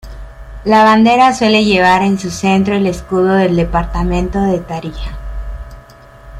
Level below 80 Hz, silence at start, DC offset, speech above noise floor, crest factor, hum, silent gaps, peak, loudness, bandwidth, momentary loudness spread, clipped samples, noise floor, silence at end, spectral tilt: -28 dBFS; 0.05 s; under 0.1%; 26 dB; 12 dB; none; none; 0 dBFS; -12 LUFS; 13 kHz; 18 LU; under 0.1%; -38 dBFS; 0 s; -5.5 dB/octave